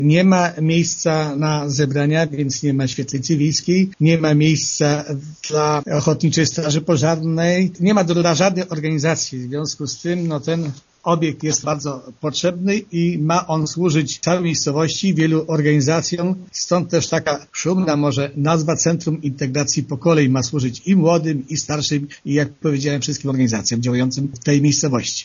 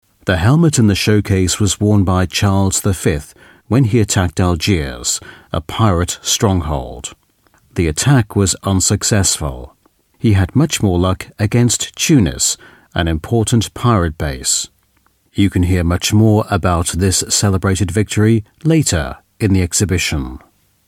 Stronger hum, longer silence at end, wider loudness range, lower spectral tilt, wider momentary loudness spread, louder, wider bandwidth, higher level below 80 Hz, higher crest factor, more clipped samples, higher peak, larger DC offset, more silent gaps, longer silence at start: neither; second, 0 s vs 0.5 s; about the same, 3 LU vs 3 LU; about the same, -5.5 dB/octave vs -4.5 dB/octave; about the same, 7 LU vs 9 LU; second, -18 LUFS vs -15 LUFS; second, 7.4 kHz vs 16 kHz; second, -54 dBFS vs -32 dBFS; about the same, 18 dB vs 14 dB; neither; about the same, 0 dBFS vs 0 dBFS; neither; neither; second, 0 s vs 0.25 s